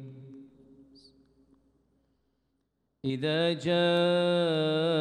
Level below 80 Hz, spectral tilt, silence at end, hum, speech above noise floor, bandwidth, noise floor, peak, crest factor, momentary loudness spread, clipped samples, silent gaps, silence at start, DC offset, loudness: -74 dBFS; -6.5 dB/octave; 0 s; none; 51 dB; 10 kHz; -78 dBFS; -16 dBFS; 14 dB; 13 LU; under 0.1%; none; 0 s; under 0.1%; -27 LUFS